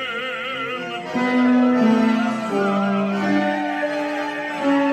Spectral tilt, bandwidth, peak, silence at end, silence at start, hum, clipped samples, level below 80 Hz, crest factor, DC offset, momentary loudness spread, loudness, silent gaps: -6 dB/octave; 9.6 kHz; -6 dBFS; 0 s; 0 s; none; under 0.1%; -68 dBFS; 14 dB; under 0.1%; 9 LU; -20 LUFS; none